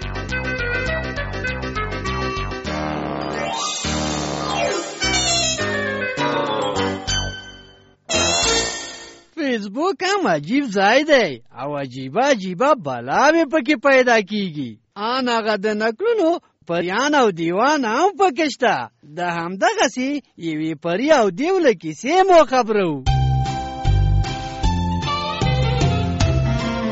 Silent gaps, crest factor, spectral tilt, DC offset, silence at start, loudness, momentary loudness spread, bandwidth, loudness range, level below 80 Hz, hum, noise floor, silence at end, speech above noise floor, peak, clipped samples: none; 16 dB; -4.5 dB/octave; under 0.1%; 0 s; -19 LUFS; 10 LU; 8.2 kHz; 4 LU; -32 dBFS; none; -48 dBFS; 0 s; 30 dB; -4 dBFS; under 0.1%